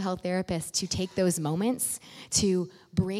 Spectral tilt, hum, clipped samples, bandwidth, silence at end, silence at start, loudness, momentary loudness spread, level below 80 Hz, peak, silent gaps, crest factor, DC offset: -4.5 dB/octave; none; under 0.1%; 16 kHz; 0 s; 0 s; -29 LUFS; 5 LU; -54 dBFS; -8 dBFS; none; 20 dB; under 0.1%